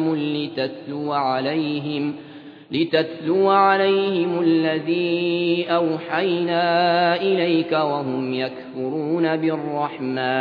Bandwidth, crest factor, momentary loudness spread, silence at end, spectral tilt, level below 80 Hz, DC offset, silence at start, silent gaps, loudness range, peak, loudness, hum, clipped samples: 5.2 kHz; 16 dB; 9 LU; 0 s; -8.5 dB/octave; -74 dBFS; under 0.1%; 0 s; none; 3 LU; -4 dBFS; -21 LUFS; none; under 0.1%